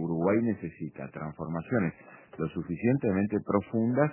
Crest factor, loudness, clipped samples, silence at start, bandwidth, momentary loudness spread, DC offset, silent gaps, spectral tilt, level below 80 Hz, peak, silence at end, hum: 20 dB; -30 LUFS; under 0.1%; 0 s; 3.2 kHz; 13 LU; under 0.1%; none; -9 dB/octave; -58 dBFS; -10 dBFS; 0 s; none